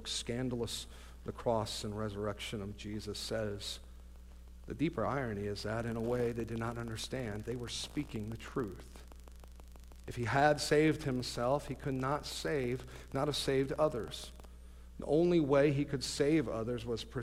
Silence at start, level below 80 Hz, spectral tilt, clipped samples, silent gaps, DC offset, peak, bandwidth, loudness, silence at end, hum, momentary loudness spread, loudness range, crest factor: 0 s; -52 dBFS; -5 dB/octave; under 0.1%; none; under 0.1%; -16 dBFS; 16 kHz; -35 LUFS; 0 s; none; 24 LU; 7 LU; 20 dB